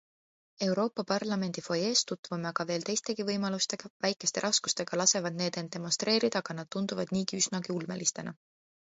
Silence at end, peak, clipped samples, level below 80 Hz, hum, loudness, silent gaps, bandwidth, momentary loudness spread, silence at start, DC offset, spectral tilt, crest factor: 0.6 s; -10 dBFS; under 0.1%; -74 dBFS; none; -31 LUFS; 2.19-2.23 s, 3.90-4.00 s; 8.2 kHz; 8 LU; 0.6 s; under 0.1%; -3 dB/octave; 22 dB